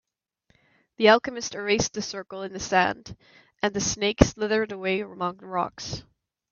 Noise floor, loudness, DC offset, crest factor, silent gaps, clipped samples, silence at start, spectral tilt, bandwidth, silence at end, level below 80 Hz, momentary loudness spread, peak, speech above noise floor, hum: -69 dBFS; -25 LUFS; under 0.1%; 26 dB; none; under 0.1%; 1 s; -4 dB/octave; 7.4 kHz; 0.5 s; -44 dBFS; 15 LU; 0 dBFS; 44 dB; none